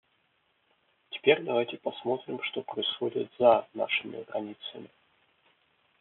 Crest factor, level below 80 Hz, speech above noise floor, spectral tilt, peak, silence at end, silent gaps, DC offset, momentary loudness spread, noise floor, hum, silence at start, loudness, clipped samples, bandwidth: 24 dB; -78 dBFS; 43 dB; -1.5 dB/octave; -8 dBFS; 1.15 s; none; under 0.1%; 16 LU; -72 dBFS; none; 1.1 s; -29 LUFS; under 0.1%; 4.2 kHz